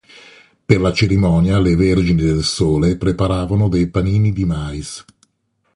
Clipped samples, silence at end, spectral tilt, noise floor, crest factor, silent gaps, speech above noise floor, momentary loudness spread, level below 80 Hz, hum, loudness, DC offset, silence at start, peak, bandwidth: under 0.1%; 0.75 s; -6.5 dB/octave; -66 dBFS; 16 dB; none; 51 dB; 10 LU; -30 dBFS; none; -16 LUFS; under 0.1%; 0.7 s; 0 dBFS; 11.5 kHz